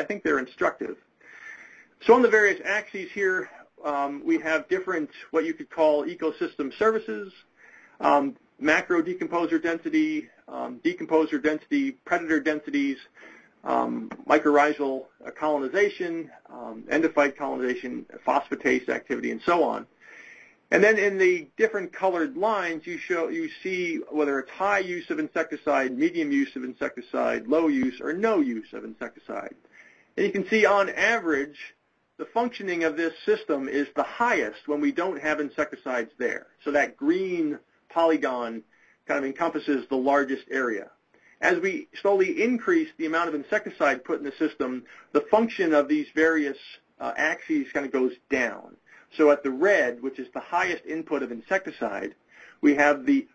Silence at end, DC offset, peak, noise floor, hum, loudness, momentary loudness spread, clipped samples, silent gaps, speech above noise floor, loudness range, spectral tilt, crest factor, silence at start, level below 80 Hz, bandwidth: 0.1 s; under 0.1%; -2 dBFS; -54 dBFS; none; -25 LUFS; 14 LU; under 0.1%; none; 29 dB; 3 LU; -5 dB/octave; 24 dB; 0 s; -68 dBFS; 8.2 kHz